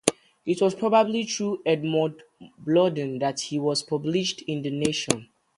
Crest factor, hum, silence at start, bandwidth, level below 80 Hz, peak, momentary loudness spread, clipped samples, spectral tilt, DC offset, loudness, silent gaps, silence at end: 24 dB; none; 0.05 s; 11.5 kHz; -64 dBFS; 0 dBFS; 8 LU; under 0.1%; -4.5 dB/octave; under 0.1%; -25 LUFS; none; 0.35 s